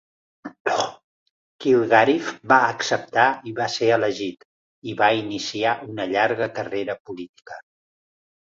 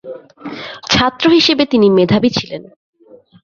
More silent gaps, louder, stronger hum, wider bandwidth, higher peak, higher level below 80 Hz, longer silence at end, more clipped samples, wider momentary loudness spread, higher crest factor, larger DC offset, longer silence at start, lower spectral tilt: first, 0.60-0.65 s, 1.04-1.59 s, 4.45-4.82 s, 7.00-7.05 s, 7.29-7.34 s vs none; second, -21 LUFS vs -12 LUFS; neither; about the same, 7.8 kHz vs 7.4 kHz; about the same, -2 dBFS vs 0 dBFS; second, -66 dBFS vs -44 dBFS; first, 0.95 s vs 0.8 s; neither; about the same, 20 LU vs 20 LU; first, 20 dB vs 14 dB; neither; first, 0.45 s vs 0.05 s; about the same, -4 dB/octave vs -5 dB/octave